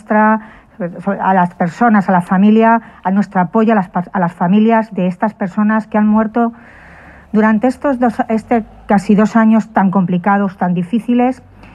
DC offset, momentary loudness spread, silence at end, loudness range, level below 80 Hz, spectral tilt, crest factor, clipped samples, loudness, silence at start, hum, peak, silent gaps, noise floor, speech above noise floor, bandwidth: under 0.1%; 7 LU; 0.4 s; 2 LU; -48 dBFS; -8.5 dB/octave; 12 dB; under 0.1%; -14 LUFS; 0.1 s; none; 0 dBFS; none; -38 dBFS; 26 dB; 9.2 kHz